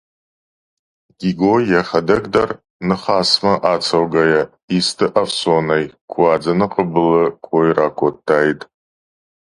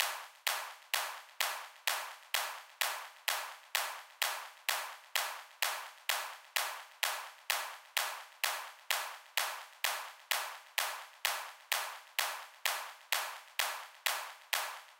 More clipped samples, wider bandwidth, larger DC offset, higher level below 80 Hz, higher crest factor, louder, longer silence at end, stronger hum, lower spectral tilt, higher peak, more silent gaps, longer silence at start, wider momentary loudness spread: neither; second, 11.5 kHz vs 17 kHz; neither; first, -50 dBFS vs under -90 dBFS; second, 16 dB vs 26 dB; first, -16 LUFS vs -37 LUFS; first, 1 s vs 0.05 s; neither; first, -5 dB/octave vs 5 dB/octave; first, 0 dBFS vs -12 dBFS; first, 2.70-2.80 s, 4.63-4.68 s, 6.01-6.08 s vs none; first, 1.2 s vs 0 s; first, 6 LU vs 3 LU